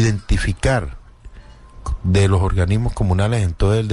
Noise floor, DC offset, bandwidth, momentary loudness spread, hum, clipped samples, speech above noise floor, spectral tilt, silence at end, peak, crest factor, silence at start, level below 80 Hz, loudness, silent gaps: -40 dBFS; under 0.1%; 11 kHz; 9 LU; none; under 0.1%; 24 dB; -6.5 dB/octave; 0 s; -6 dBFS; 12 dB; 0 s; -26 dBFS; -19 LUFS; none